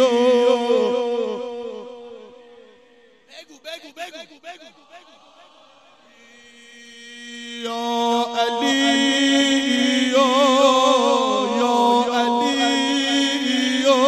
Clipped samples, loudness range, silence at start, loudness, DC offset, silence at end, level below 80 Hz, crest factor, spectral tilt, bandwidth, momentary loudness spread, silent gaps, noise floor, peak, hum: under 0.1%; 23 LU; 0 s; -18 LUFS; under 0.1%; 0 s; -68 dBFS; 16 dB; -2 dB/octave; 13.5 kHz; 21 LU; none; -53 dBFS; -4 dBFS; none